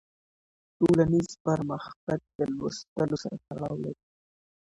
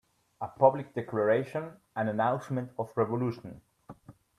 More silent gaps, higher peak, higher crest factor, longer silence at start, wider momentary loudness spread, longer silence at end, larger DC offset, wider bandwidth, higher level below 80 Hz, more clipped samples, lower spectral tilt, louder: first, 1.40-1.45 s, 1.96-2.07 s, 2.35-2.39 s, 2.88-2.96 s vs none; about the same, -10 dBFS vs -8 dBFS; about the same, 20 dB vs 24 dB; first, 0.8 s vs 0.4 s; second, 13 LU vs 16 LU; first, 0.85 s vs 0.25 s; neither; about the same, 11 kHz vs 12 kHz; first, -58 dBFS vs -70 dBFS; neither; second, -7 dB/octave vs -8.5 dB/octave; about the same, -29 LUFS vs -30 LUFS